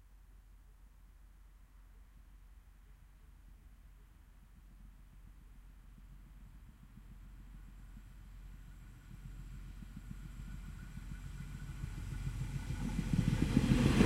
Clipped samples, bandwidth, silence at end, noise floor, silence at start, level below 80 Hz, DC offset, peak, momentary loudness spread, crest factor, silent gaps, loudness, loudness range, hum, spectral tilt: under 0.1%; 15.5 kHz; 0 s; -59 dBFS; 0 s; -48 dBFS; under 0.1%; -14 dBFS; 28 LU; 26 dB; none; -39 LUFS; 22 LU; none; -6.5 dB/octave